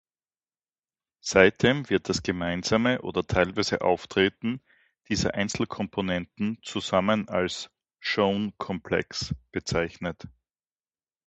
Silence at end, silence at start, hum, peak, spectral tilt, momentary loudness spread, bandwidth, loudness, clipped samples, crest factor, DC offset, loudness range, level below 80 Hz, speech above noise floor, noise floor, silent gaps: 1 s; 1.25 s; none; -2 dBFS; -4.5 dB/octave; 10 LU; 8.4 kHz; -26 LUFS; under 0.1%; 26 dB; under 0.1%; 5 LU; -50 dBFS; over 64 dB; under -90 dBFS; none